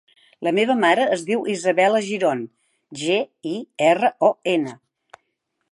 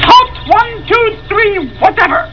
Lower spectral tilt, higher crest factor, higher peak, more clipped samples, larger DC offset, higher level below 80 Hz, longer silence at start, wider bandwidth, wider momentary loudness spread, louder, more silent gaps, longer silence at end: about the same, -4.5 dB/octave vs -4.5 dB/octave; first, 18 dB vs 10 dB; second, -4 dBFS vs 0 dBFS; second, under 0.1% vs 2%; second, under 0.1% vs 1%; second, -78 dBFS vs -32 dBFS; first, 0.4 s vs 0 s; first, 11.5 kHz vs 5.4 kHz; first, 12 LU vs 5 LU; second, -20 LUFS vs -10 LUFS; neither; first, 0.95 s vs 0 s